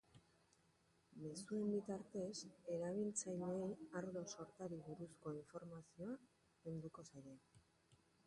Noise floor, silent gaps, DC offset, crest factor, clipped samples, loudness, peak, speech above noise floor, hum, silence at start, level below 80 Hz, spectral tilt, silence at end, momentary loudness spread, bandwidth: -78 dBFS; none; under 0.1%; 18 dB; under 0.1%; -49 LUFS; -32 dBFS; 29 dB; none; 0.15 s; -82 dBFS; -5.5 dB/octave; 0.3 s; 14 LU; 11.5 kHz